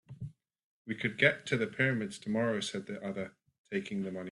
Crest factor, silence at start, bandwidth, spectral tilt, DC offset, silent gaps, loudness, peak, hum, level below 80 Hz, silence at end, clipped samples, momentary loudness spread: 24 dB; 0.1 s; 11.5 kHz; -5 dB/octave; under 0.1%; 0.64-0.85 s, 3.58-3.64 s; -33 LUFS; -10 dBFS; none; -70 dBFS; 0 s; under 0.1%; 18 LU